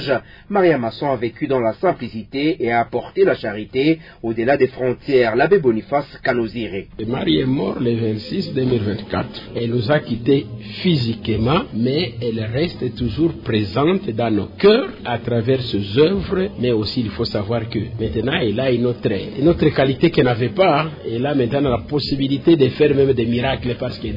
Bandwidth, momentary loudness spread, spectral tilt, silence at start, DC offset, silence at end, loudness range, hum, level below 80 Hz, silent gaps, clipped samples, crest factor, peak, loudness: 5.4 kHz; 8 LU; -9 dB/octave; 0 s; under 0.1%; 0 s; 3 LU; none; -42 dBFS; none; under 0.1%; 16 dB; -2 dBFS; -19 LUFS